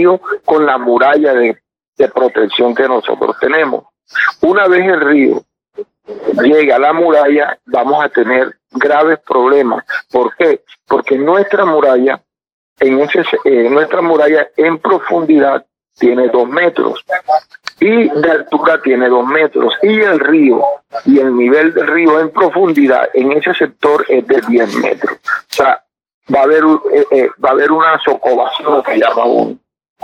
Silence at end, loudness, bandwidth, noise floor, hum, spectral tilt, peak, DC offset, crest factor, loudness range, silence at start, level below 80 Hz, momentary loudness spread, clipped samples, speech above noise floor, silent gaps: 0.45 s; -11 LUFS; 12.5 kHz; -30 dBFS; none; -6 dB/octave; 0 dBFS; under 0.1%; 10 dB; 2 LU; 0 s; -58 dBFS; 7 LU; under 0.1%; 19 dB; 1.88-1.93 s, 12.52-12.76 s, 26.14-26.21 s